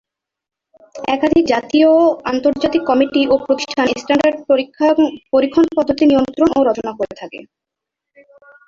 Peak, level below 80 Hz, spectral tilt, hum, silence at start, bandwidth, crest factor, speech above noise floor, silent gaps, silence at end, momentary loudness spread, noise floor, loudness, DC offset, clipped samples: 0 dBFS; -50 dBFS; -5 dB/octave; none; 0.95 s; 7.6 kHz; 14 dB; 68 dB; none; 1.25 s; 9 LU; -82 dBFS; -15 LUFS; under 0.1%; under 0.1%